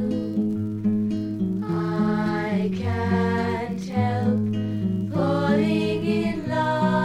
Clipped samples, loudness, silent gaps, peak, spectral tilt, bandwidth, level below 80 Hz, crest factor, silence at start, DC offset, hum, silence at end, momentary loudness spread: under 0.1%; -24 LUFS; none; -8 dBFS; -8 dB/octave; 10.5 kHz; -54 dBFS; 14 dB; 0 s; under 0.1%; none; 0 s; 5 LU